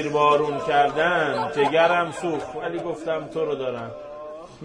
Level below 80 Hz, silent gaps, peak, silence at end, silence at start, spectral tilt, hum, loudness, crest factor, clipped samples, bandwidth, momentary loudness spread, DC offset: -58 dBFS; none; -6 dBFS; 0 s; 0 s; -5 dB/octave; none; -22 LUFS; 18 dB; under 0.1%; 10.5 kHz; 16 LU; under 0.1%